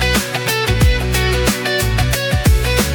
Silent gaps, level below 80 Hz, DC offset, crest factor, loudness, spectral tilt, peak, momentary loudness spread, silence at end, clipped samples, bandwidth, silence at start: none; -20 dBFS; under 0.1%; 12 dB; -15 LUFS; -4 dB/octave; -2 dBFS; 2 LU; 0 s; under 0.1%; 19 kHz; 0 s